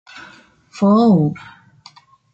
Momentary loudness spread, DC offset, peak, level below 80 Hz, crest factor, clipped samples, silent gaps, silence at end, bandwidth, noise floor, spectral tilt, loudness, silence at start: 26 LU; under 0.1%; -4 dBFS; -58 dBFS; 14 dB; under 0.1%; none; 0.95 s; 7.8 kHz; -47 dBFS; -8.5 dB/octave; -15 LUFS; 0.15 s